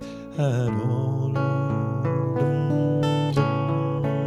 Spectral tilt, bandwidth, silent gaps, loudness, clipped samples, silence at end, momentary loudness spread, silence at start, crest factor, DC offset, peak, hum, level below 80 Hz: -8.5 dB/octave; 8.4 kHz; none; -24 LUFS; under 0.1%; 0 s; 3 LU; 0 s; 14 dB; under 0.1%; -8 dBFS; none; -52 dBFS